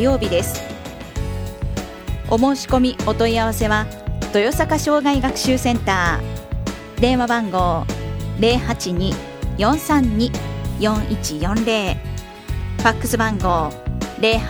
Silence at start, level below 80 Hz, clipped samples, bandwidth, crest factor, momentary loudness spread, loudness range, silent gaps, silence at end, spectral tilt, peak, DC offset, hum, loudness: 0 s; -30 dBFS; under 0.1%; over 20 kHz; 20 dB; 10 LU; 2 LU; none; 0 s; -5 dB/octave; 0 dBFS; under 0.1%; none; -20 LUFS